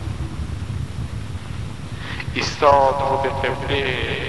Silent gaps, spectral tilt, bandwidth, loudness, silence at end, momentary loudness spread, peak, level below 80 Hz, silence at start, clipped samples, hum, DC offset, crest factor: none; -5.5 dB/octave; 11.5 kHz; -22 LUFS; 0 s; 16 LU; -2 dBFS; -34 dBFS; 0 s; under 0.1%; none; 1%; 20 dB